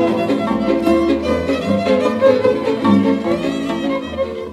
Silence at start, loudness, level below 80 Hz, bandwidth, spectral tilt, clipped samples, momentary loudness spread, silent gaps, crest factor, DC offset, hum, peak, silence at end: 0 s; -16 LUFS; -42 dBFS; 14 kHz; -7 dB/octave; under 0.1%; 7 LU; none; 16 dB; under 0.1%; none; 0 dBFS; 0 s